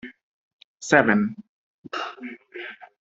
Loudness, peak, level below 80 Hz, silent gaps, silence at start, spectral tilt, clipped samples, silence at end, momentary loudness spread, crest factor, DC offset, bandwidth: -22 LUFS; -2 dBFS; -66 dBFS; 0.23-0.76 s, 1.49-1.84 s; 0.05 s; -5 dB/octave; under 0.1%; 0.15 s; 21 LU; 24 dB; under 0.1%; 8 kHz